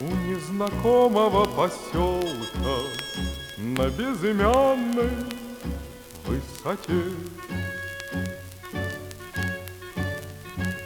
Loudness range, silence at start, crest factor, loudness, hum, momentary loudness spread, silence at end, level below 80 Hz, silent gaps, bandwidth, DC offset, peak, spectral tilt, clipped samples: 8 LU; 0 s; 22 dB; -26 LUFS; none; 15 LU; 0 s; -40 dBFS; none; over 20 kHz; under 0.1%; -6 dBFS; -5.5 dB/octave; under 0.1%